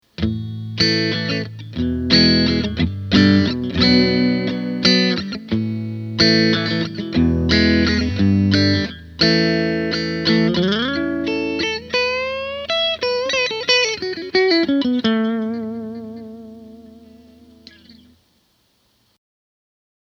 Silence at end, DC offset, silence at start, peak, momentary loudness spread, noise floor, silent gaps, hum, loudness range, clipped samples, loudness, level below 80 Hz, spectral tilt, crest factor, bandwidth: 2.1 s; under 0.1%; 0.2 s; 0 dBFS; 11 LU; -62 dBFS; none; none; 5 LU; under 0.1%; -17 LUFS; -38 dBFS; -5.5 dB/octave; 18 dB; 7.4 kHz